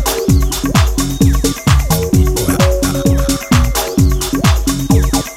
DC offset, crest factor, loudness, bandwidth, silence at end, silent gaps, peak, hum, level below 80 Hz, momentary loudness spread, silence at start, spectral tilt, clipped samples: under 0.1%; 12 dB; -13 LUFS; 16.5 kHz; 0 s; none; 0 dBFS; none; -16 dBFS; 2 LU; 0 s; -5 dB/octave; under 0.1%